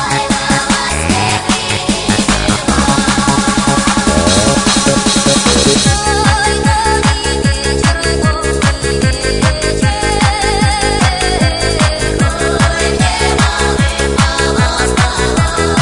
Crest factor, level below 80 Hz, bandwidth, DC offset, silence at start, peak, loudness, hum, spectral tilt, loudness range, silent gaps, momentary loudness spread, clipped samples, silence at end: 12 dB; -22 dBFS; 11 kHz; 0.9%; 0 s; 0 dBFS; -11 LUFS; none; -4 dB/octave; 3 LU; none; 4 LU; under 0.1%; 0 s